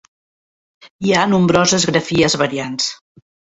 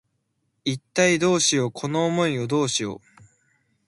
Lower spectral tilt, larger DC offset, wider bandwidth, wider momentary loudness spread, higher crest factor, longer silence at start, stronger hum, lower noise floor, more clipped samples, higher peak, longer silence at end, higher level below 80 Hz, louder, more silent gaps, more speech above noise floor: about the same, -4 dB/octave vs -4 dB/octave; neither; second, 8.2 kHz vs 11.5 kHz; second, 8 LU vs 11 LU; about the same, 16 dB vs 18 dB; first, 0.85 s vs 0.65 s; neither; first, under -90 dBFS vs -73 dBFS; neither; first, -2 dBFS vs -6 dBFS; second, 0.65 s vs 0.9 s; first, -50 dBFS vs -64 dBFS; first, -16 LUFS vs -22 LUFS; first, 0.90-0.99 s vs none; first, over 75 dB vs 51 dB